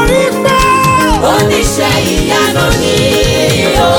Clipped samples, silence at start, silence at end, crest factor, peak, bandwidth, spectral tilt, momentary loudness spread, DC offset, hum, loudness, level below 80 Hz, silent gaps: under 0.1%; 0 s; 0 s; 10 dB; 0 dBFS; over 20 kHz; -4 dB/octave; 2 LU; under 0.1%; none; -9 LUFS; -22 dBFS; none